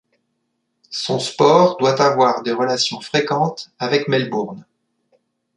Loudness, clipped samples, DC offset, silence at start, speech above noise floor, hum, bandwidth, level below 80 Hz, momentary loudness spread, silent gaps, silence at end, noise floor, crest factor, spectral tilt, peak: -17 LUFS; under 0.1%; under 0.1%; 0.9 s; 54 dB; none; 11 kHz; -64 dBFS; 12 LU; none; 0.95 s; -72 dBFS; 18 dB; -4.5 dB/octave; -2 dBFS